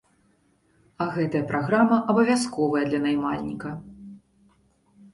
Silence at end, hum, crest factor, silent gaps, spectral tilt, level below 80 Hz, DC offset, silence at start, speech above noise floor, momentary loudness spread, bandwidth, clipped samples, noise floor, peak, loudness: 0.95 s; none; 18 dB; none; -6 dB/octave; -60 dBFS; under 0.1%; 1 s; 41 dB; 16 LU; 11.5 kHz; under 0.1%; -64 dBFS; -8 dBFS; -24 LUFS